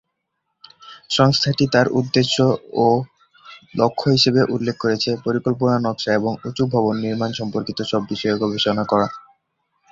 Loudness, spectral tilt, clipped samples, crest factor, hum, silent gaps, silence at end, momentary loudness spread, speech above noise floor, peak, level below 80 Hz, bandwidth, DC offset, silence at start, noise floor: -19 LUFS; -5.5 dB/octave; under 0.1%; 18 dB; none; none; 0.7 s; 8 LU; 57 dB; -2 dBFS; -54 dBFS; 7.8 kHz; under 0.1%; 0.85 s; -75 dBFS